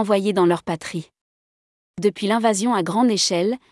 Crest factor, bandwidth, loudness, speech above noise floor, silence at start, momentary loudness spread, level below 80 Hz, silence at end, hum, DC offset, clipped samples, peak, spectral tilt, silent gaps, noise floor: 14 dB; 12 kHz; -20 LUFS; over 70 dB; 0 s; 11 LU; -66 dBFS; 0.15 s; none; under 0.1%; under 0.1%; -6 dBFS; -4.5 dB/octave; 1.21-1.94 s; under -90 dBFS